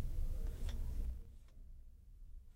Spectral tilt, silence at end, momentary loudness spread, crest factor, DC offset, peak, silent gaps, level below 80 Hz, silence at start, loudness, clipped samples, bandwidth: -6.5 dB/octave; 0 s; 17 LU; 14 dB; under 0.1%; -28 dBFS; none; -42 dBFS; 0 s; -47 LUFS; under 0.1%; 15.5 kHz